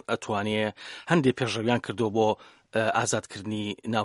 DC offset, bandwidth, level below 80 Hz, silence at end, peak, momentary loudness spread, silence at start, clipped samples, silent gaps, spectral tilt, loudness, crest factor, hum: under 0.1%; 11.5 kHz; -66 dBFS; 0 s; -6 dBFS; 8 LU; 0.1 s; under 0.1%; none; -5 dB/octave; -27 LUFS; 22 dB; none